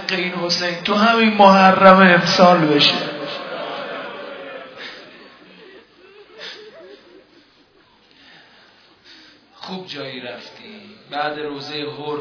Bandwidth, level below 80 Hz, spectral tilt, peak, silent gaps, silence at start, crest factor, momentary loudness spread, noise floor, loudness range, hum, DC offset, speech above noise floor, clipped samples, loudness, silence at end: 5.4 kHz; -62 dBFS; -5 dB/octave; 0 dBFS; none; 0 s; 18 dB; 24 LU; -54 dBFS; 24 LU; none; under 0.1%; 39 dB; under 0.1%; -15 LUFS; 0 s